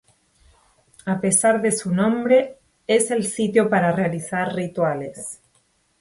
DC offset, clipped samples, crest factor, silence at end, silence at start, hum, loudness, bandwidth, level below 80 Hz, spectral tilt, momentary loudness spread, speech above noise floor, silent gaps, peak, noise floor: under 0.1%; under 0.1%; 18 dB; 0.65 s; 1.05 s; none; -20 LUFS; 12 kHz; -60 dBFS; -4.5 dB/octave; 16 LU; 44 dB; none; -4 dBFS; -64 dBFS